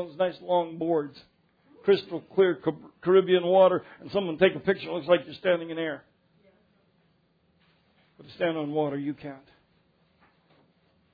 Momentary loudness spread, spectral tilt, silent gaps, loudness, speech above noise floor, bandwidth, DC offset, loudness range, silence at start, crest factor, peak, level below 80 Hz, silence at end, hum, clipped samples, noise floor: 13 LU; -8.5 dB/octave; none; -26 LUFS; 42 dB; 5 kHz; under 0.1%; 11 LU; 0 s; 20 dB; -6 dBFS; -70 dBFS; 1.75 s; none; under 0.1%; -68 dBFS